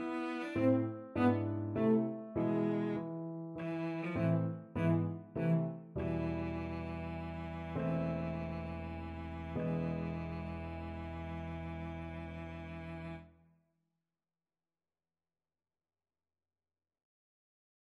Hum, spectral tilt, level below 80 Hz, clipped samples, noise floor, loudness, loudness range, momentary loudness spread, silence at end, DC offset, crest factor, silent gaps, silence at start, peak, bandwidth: none; -9.5 dB/octave; -56 dBFS; under 0.1%; under -90 dBFS; -38 LUFS; 13 LU; 12 LU; 4.55 s; under 0.1%; 20 dB; none; 0 s; -18 dBFS; 5.2 kHz